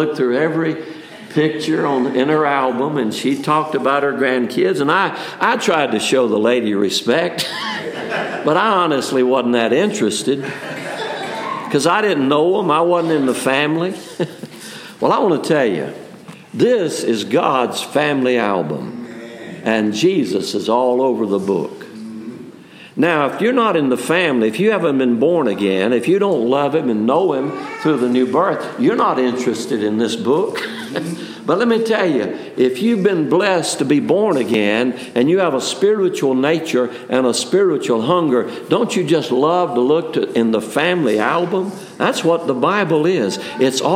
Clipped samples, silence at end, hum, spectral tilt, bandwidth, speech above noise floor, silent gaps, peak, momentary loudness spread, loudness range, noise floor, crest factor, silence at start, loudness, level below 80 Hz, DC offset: under 0.1%; 0 s; none; -5 dB/octave; 16 kHz; 23 dB; none; 0 dBFS; 9 LU; 3 LU; -39 dBFS; 16 dB; 0 s; -17 LUFS; -70 dBFS; under 0.1%